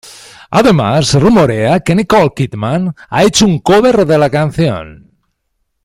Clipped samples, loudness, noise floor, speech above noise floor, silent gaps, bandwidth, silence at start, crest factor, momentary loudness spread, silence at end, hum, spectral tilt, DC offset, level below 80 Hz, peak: under 0.1%; -11 LUFS; -66 dBFS; 56 dB; none; 16 kHz; 0.05 s; 12 dB; 7 LU; 0.9 s; none; -5.5 dB/octave; under 0.1%; -38 dBFS; 0 dBFS